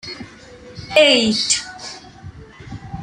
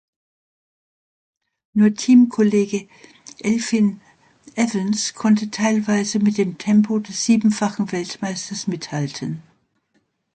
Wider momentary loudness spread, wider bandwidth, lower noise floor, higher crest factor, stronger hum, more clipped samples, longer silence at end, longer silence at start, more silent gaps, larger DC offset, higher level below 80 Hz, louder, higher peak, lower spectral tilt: first, 24 LU vs 11 LU; first, 11.5 kHz vs 9.2 kHz; second, -41 dBFS vs -67 dBFS; about the same, 20 dB vs 16 dB; neither; neither; second, 0 s vs 0.95 s; second, 0.05 s vs 1.75 s; neither; neither; first, -48 dBFS vs -64 dBFS; first, -15 LUFS vs -20 LUFS; about the same, -2 dBFS vs -4 dBFS; second, -2.5 dB/octave vs -5 dB/octave